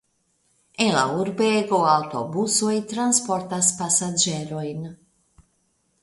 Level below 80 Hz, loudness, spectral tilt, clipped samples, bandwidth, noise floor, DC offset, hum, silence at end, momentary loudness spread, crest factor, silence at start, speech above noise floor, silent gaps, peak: -64 dBFS; -21 LUFS; -3 dB/octave; under 0.1%; 12 kHz; -68 dBFS; under 0.1%; none; 1.1 s; 11 LU; 20 dB; 0.8 s; 46 dB; none; -4 dBFS